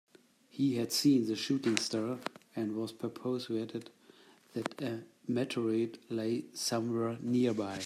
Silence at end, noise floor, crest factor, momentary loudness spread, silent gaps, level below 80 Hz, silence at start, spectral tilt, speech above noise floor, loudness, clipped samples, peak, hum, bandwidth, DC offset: 0 s; -62 dBFS; 28 dB; 11 LU; none; -78 dBFS; 0.55 s; -4.5 dB/octave; 29 dB; -34 LUFS; under 0.1%; -6 dBFS; none; 15 kHz; under 0.1%